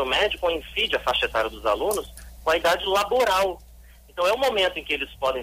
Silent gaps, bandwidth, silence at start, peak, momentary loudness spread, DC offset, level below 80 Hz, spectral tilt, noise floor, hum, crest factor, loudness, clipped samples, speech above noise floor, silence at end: none; 16 kHz; 0 s; -10 dBFS; 7 LU; under 0.1%; -46 dBFS; -2.5 dB/octave; -48 dBFS; none; 14 dB; -23 LUFS; under 0.1%; 25 dB; 0 s